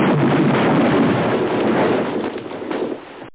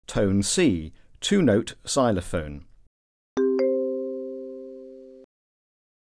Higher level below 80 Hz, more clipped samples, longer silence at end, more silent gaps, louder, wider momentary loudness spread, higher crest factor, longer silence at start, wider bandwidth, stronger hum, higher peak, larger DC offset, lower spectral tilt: second, -52 dBFS vs -46 dBFS; neither; second, 0 s vs 0.8 s; second, none vs 2.87-3.37 s; first, -18 LUFS vs -24 LUFS; second, 11 LU vs 20 LU; second, 12 dB vs 18 dB; about the same, 0 s vs 0.1 s; second, 4 kHz vs 11 kHz; neither; about the same, -6 dBFS vs -8 dBFS; first, 0.2% vs under 0.1%; first, -11 dB/octave vs -5 dB/octave